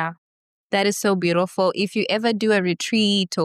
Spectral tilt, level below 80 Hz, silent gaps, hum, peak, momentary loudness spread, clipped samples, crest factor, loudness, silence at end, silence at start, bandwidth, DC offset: -4.5 dB/octave; -72 dBFS; 0.18-0.70 s; none; -8 dBFS; 3 LU; under 0.1%; 14 dB; -21 LUFS; 0 s; 0 s; 13.5 kHz; under 0.1%